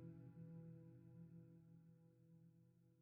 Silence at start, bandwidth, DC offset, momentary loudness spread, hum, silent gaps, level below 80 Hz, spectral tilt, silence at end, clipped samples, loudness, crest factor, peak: 0 s; 2.7 kHz; under 0.1%; 8 LU; none; none; -88 dBFS; -11 dB/octave; 0 s; under 0.1%; -62 LUFS; 16 dB; -48 dBFS